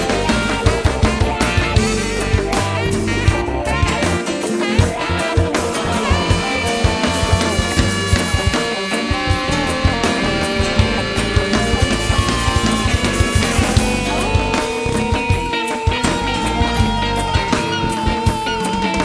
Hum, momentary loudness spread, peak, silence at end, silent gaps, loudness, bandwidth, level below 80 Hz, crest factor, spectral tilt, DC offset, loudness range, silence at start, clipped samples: none; 3 LU; 0 dBFS; 0 s; none; -17 LUFS; 11 kHz; -24 dBFS; 16 dB; -4.5 dB/octave; under 0.1%; 1 LU; 0 s; under 0.1%